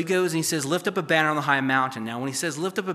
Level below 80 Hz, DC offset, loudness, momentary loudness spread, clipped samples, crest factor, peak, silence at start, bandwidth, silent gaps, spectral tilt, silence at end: -76 dBFS; under 0.1%; -24 LUFS; 7 LU; under 0.1%; 20 dB; -6 dBFS; 0 s; 15 kHz; none; -4 dB/octave; 0 s